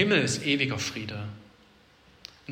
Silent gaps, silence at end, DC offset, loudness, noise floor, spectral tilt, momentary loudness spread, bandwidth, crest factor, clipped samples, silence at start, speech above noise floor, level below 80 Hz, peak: none; 0 s; under 0.1%; -27 LUFS; -58 dBFS; -4 dB/octave; 24 LU; 16 kHz; 20 dB; under 0.1%; 0 s; 31 dB; -64 dBFS; -10 dBFS